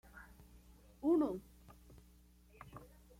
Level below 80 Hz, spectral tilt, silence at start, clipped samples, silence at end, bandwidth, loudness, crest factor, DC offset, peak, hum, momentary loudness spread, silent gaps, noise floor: -64 dBFS; -7.5 dB/octave; 0.15 s; under 0.1%; 0.35 s; 16 kHz; -37 LUFS; 18 dB; under 0.1%; -24 dBFS; none; 28 LU; none; -65 dBFS